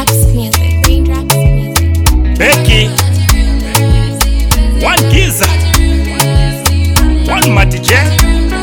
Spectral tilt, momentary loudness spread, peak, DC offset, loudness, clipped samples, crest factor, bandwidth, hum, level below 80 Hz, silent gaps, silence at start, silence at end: -4.5 dB/octave; 4 LU; 0 dBFS; under 0.1%; -10 LUFS; 2%; 8 dB; over 20 kHz; none; -12 dBFS; none; 0 s; 0 s